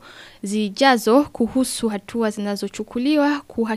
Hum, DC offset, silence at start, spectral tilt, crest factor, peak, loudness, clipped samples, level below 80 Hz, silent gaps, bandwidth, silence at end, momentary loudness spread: none; under 0.1%; 0.05 s; -4 dB/octave; 18 dB; -2 dBFS; -20 LUFS; under 0.1%; -54 dBFS; none; 15.5 kHz; 0 s; 10 LU